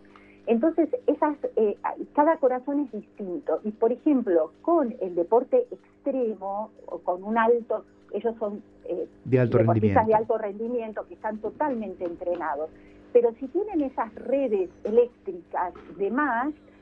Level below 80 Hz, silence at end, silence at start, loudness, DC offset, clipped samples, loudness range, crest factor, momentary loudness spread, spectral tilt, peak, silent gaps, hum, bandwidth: -62 dBFS; 0.25 s; 0.45 s; -26 LUFS; under 0.1%; under 0.1%; 3 LU; 18 dB; 12 LU; -10.5 dB/octave; -8 dBFS; none; 50 Hz at -60 dBFS; 4.1 kHz